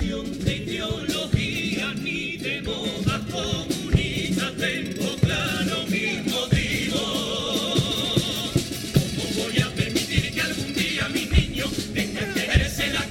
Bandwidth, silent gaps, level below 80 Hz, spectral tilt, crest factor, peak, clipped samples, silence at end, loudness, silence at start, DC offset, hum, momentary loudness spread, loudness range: 17 kHz; none; -36 dBFS; -4.5 dB/octave; 20 dB; -4 dBFS; under 0.1%; 0 s; -24 LUFS; 0 s; under 0.1%; none; 5 LU; 2 LU